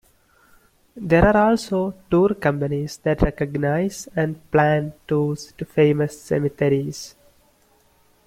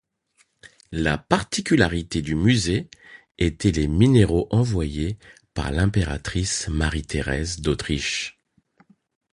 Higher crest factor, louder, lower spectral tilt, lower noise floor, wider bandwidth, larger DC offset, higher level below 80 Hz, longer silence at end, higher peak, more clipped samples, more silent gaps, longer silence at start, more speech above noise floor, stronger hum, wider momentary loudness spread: about the same, 18 dB vs 22 dB; about the same, -21 LUFS vs -22 LUFS; first, -7 dB/octave vs -5.5 dB/octave; second, -59 dBFS vs -65 dBFS; first, 15.5 kHz vs 11.5 kHz; neither; about the same, -38 dBFS vs -34 dBFS; first, 1.2 s vs 1.05 s; about the same, -2 dBFS vs -2 dBFS; neither; neither; first, 0.95 s vs 0.65 s; second, 39 dB vs 43 dB; neither; about the same, 9 LU vs 10 LU